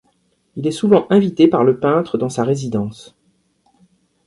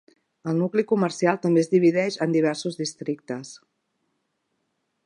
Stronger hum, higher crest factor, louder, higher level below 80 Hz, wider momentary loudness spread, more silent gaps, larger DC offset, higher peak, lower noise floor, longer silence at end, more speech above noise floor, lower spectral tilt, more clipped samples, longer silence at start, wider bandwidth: neither; about the same, 16 dB vs 20 dB; first, -16 LUFS vs -23 LUFS; first, -56 dBFS vs -76 dBFS; second, 11 LU vs 14 LU; neither; neither; first, 0 dBFS vs -4 dBFS; second, -62 dBFS vs -75 dBFS; second, 1.25 s vs 1.5 s; second, 47 dB vs 53 dB; about the same, -7 dB/octave vs -6 dB/octave; neither; about the same, 0.55 s vs 0.45 s; about the same, 11.5 kHz vs 11.5 kHz